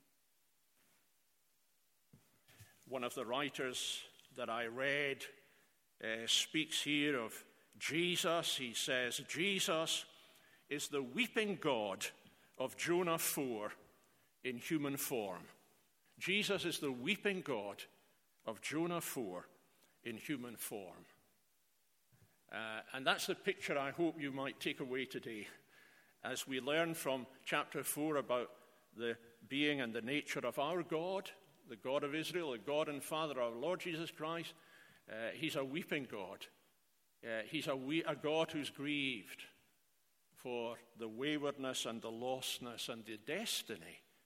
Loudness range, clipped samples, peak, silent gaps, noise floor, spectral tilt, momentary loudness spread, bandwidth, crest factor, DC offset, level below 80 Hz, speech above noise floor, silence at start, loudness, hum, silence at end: 7 LU; under 0.1%; -16 dBFS; none; -79 dBFS; -3 dB/octave; 14 LU; 16.5 kHz; 26 dB; under 0.1%; -86 dBFS; 38 dB; 2.15 s; -40 LUFS; none; 0.25 s